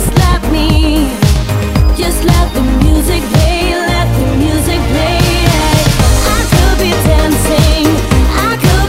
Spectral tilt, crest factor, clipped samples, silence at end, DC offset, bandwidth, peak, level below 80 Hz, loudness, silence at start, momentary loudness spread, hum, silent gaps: -5 dB/octave; 10 dB; 0.7%; 0 s; under 0.1%; 16.5 kHz; 0 dBFS; -14 dBFS; -11 LUFS; 0 s; 3 LU; none; none